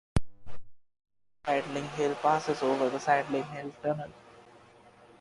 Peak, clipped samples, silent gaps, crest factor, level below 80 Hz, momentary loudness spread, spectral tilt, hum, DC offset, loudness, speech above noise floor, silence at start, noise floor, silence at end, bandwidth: -12 dBFS; under 0.1%; none; 20 dB; -50 dBFS; 10 LU; -5.5 dB/octave; none; under 0.1%; -31 LUFS; 27 dB; 0.15 s; -57 dBFS; 0.8 s; 11.5 kHz